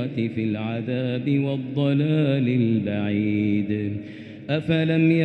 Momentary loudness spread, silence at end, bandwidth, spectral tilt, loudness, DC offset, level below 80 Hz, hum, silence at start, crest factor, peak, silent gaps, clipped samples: 7 LU; 0 s; 5 kHz; -9.5 dB/octave; -23 LUFS; under 0.1%; -60 dBFS; none; 0 s; 14 dB; -10 dBFS; none; under 0.1%